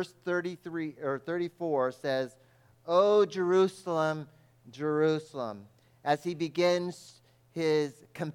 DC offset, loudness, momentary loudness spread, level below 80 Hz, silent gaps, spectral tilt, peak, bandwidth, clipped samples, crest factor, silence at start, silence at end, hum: under 0.1%; -30 LUFS; 13 LU; -80 dBFS; none; -6 dB/octave; -12 dBFS; 15 kHz; under 0.1%; 18 dB; 0 s; 0 s; none